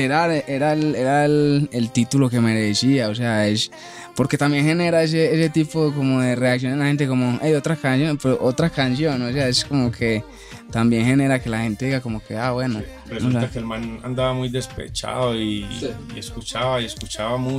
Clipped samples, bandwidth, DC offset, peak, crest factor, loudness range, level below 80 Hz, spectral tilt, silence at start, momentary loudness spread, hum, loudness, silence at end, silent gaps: under 0.1%; 15 kHz; under 0.1%; -6 dBFS; 14 dB; 6 LU; -46 dBFS; -5.5 dB/octave; 0 s; 10 LU; none; -20 LUFS; 0 s; none